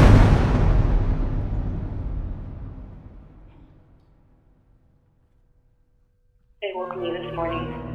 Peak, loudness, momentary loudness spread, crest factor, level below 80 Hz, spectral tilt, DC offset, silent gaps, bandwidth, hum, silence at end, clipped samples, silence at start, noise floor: -2 dBFS; -24 LUFS; 21 LU; 20 dB; -26 dBFS; -8 dB/octave; under 0.1%; none; 8.6 kHz; none; 0 s; under 0.1%; 0 s; -62 dBFS